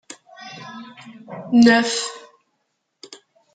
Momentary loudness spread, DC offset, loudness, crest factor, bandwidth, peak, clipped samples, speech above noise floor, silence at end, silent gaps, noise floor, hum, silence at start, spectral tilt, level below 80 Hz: 27 LU; under 0.1%; -17 LUFS; 20 dB; 9.2 kHz; -2 dBFS; under 0.1%; 56 dB; 1.35 s; none; -73 dBFS; none; 0.4 s; -3.5 dB/octave; -66 dBFS